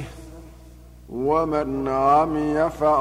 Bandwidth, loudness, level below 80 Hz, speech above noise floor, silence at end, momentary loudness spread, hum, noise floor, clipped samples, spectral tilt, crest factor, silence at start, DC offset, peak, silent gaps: 15.5 kHz; -21 LUFS; -44 dBFS; 24 dB; 0 s; 19 LU; 60 Hz at -40 dBFS; -45 dBFS; under 0.1%; -7.5 dB/octave; 16 dB; 0 s; under 0.1%; -8 dBFS; none